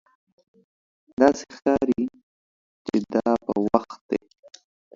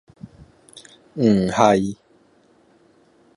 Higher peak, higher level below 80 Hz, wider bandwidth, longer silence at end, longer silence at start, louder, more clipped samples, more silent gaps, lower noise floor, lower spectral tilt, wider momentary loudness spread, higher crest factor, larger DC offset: about the same, 0 dBFS vs -2 dBFS; about the same, -56 dBFS vs -54 dBFS; second, 7.6 kHz vs 11.5 kHz; second, 0.8 s vs 1.4 s; first, 1.2 s vs 0.25 s; second, -24 LUFS vs -18 LUFS; neither; first, 2.23-2.85 s, 4.01-4.09 s vs none; first, under -90 dBFS vs -57 dBFS; about the same, -6 dB/octave vs -6.5 dB/octave; second, 10 LU vs 20 LU; about the same, 24 dB vs 22 dB; neither